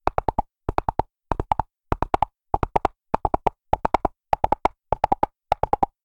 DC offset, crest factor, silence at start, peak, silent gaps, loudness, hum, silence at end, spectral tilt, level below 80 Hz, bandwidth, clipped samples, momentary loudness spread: under 0.1%; 24 dB; 0.05 s; -2 dBFS; none; -25 LUFS; none; 0.2 s; -7.5 dB/octave; -36 dBFS; 11.5 kHz; under 0.1%; 6 LU